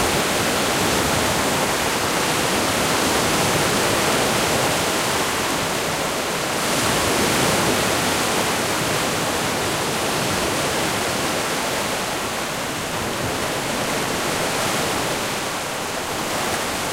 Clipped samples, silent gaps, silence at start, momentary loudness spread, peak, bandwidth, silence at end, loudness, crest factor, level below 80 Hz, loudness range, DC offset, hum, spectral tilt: under 0.1%; none; 0 s; 5 LU; -6 dBFS; 16 kHz; 0 s; -20 LUFS; 16 dB; -44 dBFS; 4 LU; under 0.1%; none; -2.5 dB/octave